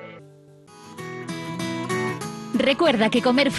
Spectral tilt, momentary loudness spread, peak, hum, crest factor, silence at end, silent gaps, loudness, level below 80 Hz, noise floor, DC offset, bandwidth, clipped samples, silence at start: -5 dB/octave; 18 LU; -8 dBFS; none; 16 dB; 0 s; none; -23 LUFS; -60 dBFS; -49 dBFS; under 0.1%; 12.5 kHz; under 0.1%; 0 s